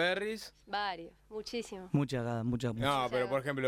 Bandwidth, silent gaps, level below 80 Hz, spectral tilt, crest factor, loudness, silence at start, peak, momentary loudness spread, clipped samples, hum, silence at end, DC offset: 15.5 kHz; none; -60 dBFS; -5.5 dB/octave; 18 dB; -35 LUFS; 0 s; -16 dBFS; 11 LU; under 0.1%; none; 0 s; under 0.1%